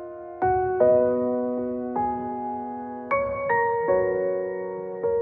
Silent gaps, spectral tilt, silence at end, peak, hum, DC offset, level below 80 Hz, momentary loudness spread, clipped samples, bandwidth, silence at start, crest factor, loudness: none; -7.5 dB/octave; 0 s; -8 dBFS; none; under 0.1%; -54 dBFS; 11 LU; under 0.1%; 3.2 kHz; 0 s; 18 dB; -25 LUFS